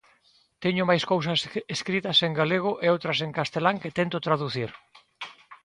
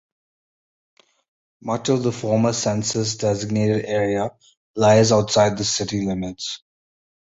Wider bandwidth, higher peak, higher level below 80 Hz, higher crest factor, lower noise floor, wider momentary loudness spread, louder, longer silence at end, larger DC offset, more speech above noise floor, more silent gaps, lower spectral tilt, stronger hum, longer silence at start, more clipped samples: first, 11 kHz vs 8 kHz; second, -6 dBFS vs -2 dBFS; second, -66 dBFS vs -52 dBFS; about the same, 22 dB vs 18 dB; second, -63 dBFS vs under -90 dBFS; about the same, 12 LU vs 14 LU; second, -25 LUFS vs -20 LUFS; second, 0.1 s vs 0.75 s; neither; second, 38 dB vs over 70 dB; second, none vs 4.57-4.74 s; about the same, -5 dB/octave vs -5 dB/octave; neither; second, 0.6 s vs 1.65 s; neither